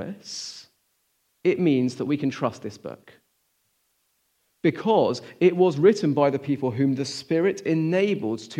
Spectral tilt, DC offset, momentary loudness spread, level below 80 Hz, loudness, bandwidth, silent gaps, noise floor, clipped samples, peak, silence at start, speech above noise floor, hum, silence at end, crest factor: -6.5 dB/octave; under 0.1%; 14 LU; -74 dBFS; -23 LUFS; 10.5 kHz; none; -71 dBFS; under 0.1%; -6 dBFS; 0 s; 48 dB; none; 0 s; 20 dB